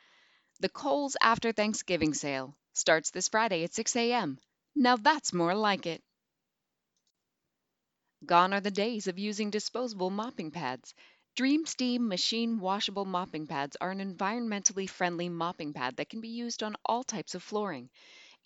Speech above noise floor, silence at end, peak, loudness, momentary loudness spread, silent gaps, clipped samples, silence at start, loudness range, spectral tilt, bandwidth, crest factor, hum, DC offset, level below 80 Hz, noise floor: 55 dB; 0.25 s; -4 dBFS; -31 LUFS; 11 LU; none; under 0.1%; 0.6 s; 4 LU; -3 dB/octave; 9 kHz; 28 dB; none; under 0.1%; -70 dBFS; -86 dBFS